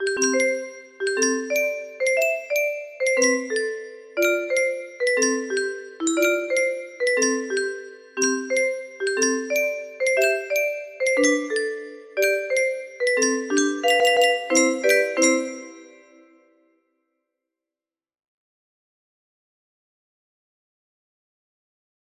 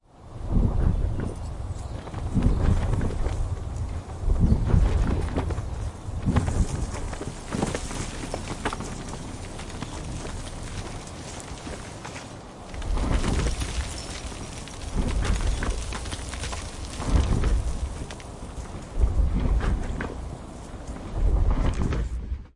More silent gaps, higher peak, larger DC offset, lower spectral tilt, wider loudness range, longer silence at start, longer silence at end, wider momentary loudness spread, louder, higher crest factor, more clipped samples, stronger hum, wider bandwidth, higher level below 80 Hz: neither; about the same, -6 dBFS vs -8 dBFS; neither; second, 0 dB/octave vs -6 dB/octave; second, 3 LU vs 8 LU; second, 0 s vs 0.15 s; first, 6.3 s vs 0.05 s; about the same, 10 LU vs 12 LU; first, -22 LUFS vs -29 LUFS; about the same, 18 dB vs 18 dB; neither; neither; first, 15.5 kHz vs 11.5 kHz; second, -74 dBFS vs -28 dBFS